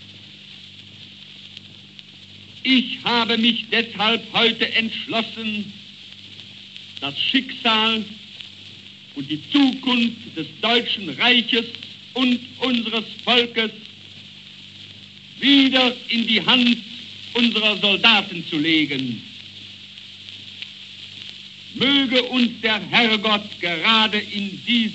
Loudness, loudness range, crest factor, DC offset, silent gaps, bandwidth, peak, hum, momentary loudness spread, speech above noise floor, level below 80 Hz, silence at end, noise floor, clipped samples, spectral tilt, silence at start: -18 LUFS; 6 LU; 22 dB; under 0.1%; none; 8.2 kHz; 0 dBFS; none; 23 LU; 23 dB; -70 dBFS; 0 s; -43 dBFS; under 0.1%; -4 dB/octave; 0 s